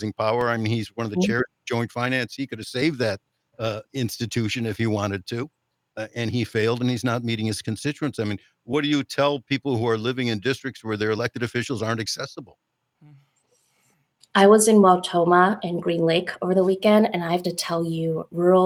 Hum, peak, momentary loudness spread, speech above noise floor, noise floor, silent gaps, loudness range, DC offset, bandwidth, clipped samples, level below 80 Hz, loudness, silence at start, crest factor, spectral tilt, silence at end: none; -2 dBFS; 12 LU; 44 dB; -67 dBFS; none; 9 LU; under 0.1%; 16.5 kHz; under 0.1%; -64 dBFS; -23 LUFS; 0 s; 20 dB; -5 dB/octave; 0 s